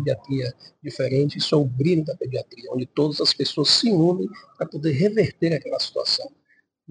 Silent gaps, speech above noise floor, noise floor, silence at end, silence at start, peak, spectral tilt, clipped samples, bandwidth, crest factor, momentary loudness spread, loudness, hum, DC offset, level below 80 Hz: none; 42 dB; -64 dBFS; 0.65 s; 0 s; -4 dBFS; -5.5 dB/octave; under 0.1%; 10 kHz; 18 dB; 14 LU; -22 LUFS; none; under 0.1%; -60 dBFS